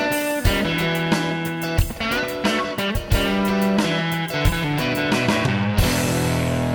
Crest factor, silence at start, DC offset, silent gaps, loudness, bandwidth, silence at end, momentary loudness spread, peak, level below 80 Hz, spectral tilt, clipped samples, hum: 16 dB; 0 s; under 0.1%; none; -21 LUFS; over 20 kHz; 0 s; 3 LU; -4 dBFS; -30 dBFS; -5 dB/octave; under 0.1%; none